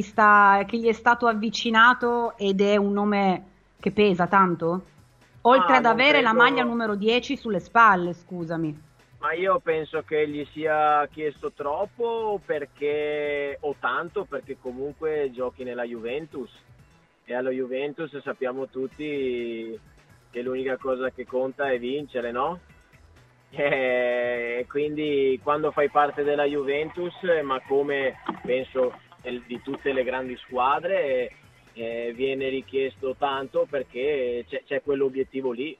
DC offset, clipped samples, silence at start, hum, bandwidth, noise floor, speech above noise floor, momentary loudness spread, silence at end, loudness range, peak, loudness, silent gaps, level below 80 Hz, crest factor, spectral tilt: under 0.1%; under 0.1%; 0 s; none; 7.8 kHz; -57 dBFS; 33 dB; 15 LU; 0.05 s; 11 LU; -2 dBFS; -24 LUFS; none; -60 dBFS; 22 dB; -5.5 dB/octave